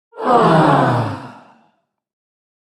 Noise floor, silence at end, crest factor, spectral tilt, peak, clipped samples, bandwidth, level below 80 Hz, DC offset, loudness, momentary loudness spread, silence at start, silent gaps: -63 dBFS; 1.5 s; 16 dB; -7.5 dB/octave; 0 dBFS; under 0.1%; 12 kHz; -52 dBFS; under 0.1%; -14 LUFS; 13 LU; 0.15 s; none